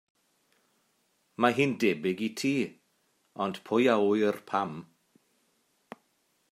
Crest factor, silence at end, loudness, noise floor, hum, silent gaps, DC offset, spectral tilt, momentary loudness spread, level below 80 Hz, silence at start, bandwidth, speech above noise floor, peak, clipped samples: 24 dB; 1.7 s; -28 LUFS; -73 dBFS; none; none; under 0.1%; -5.5 dB/octave; 13 LU; -78 dBFS; 1.4 s; 15.5 kHz; 45 dB; -8 dBFS; under 0.1%